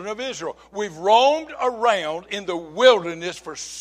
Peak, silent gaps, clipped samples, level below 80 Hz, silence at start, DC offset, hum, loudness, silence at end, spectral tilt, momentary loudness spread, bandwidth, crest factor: 0 dBFS; none; under 0.1%; -62 dBFS; 0 s; under 0.1%; none; -21 LUFS; 0 s; -2.5 dB/octave; 15 LU; 10.5 kHz; 20 dB